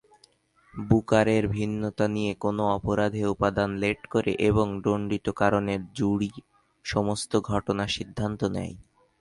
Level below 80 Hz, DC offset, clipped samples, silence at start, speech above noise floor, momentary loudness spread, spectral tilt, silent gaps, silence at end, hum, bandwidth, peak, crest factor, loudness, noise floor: -48 dBFS; under 0.1%; under 0.1%; 0.75 s; 36 dB; 7 LU; -6.5 dB/octave; none; 0.4 s; none; 11.5 kHz; -6 dBFS; 20 dB; -26 LUFS; -62 dBFS